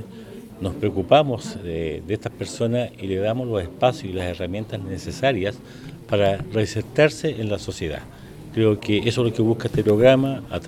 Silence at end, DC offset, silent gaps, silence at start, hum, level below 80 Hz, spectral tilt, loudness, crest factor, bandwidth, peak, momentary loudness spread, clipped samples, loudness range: 0 s; under 0.1%; none; 0 s; none; -46 dBFS; -6.5 dB/octave; -22 LUFS; 20 dB; 15 kHz; -2 dBFS; 13 LU; under 0.1%; 4 LU